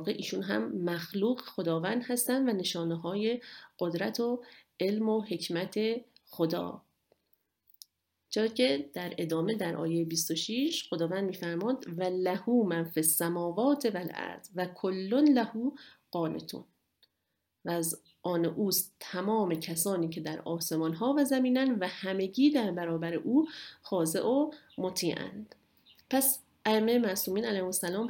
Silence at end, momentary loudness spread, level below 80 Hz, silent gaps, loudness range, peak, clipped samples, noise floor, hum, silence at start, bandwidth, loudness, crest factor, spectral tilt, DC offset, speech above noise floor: 0 s; 10 LU; -76 dBFS; none; 5 LU; -12 dBFS; under 0.1%; -82 dBFS; none; 0 s; 17 kHz; -31 LUFS; 20 dB; -4.5 dB/octave; under 0.1%; 52 dB